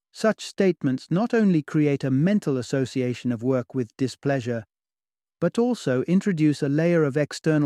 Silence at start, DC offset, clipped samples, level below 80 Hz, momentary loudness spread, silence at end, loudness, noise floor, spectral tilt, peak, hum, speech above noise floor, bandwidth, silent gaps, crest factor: 0.15 s; under 0.1%; under 0.1%; -66 dBFS; 6 LU; 0 s; -24 LUFS; under -90 dBFS; -7 dB/octave; -8 dBFS; none; over 67 dB; 12.5 kHz; none; 16 dB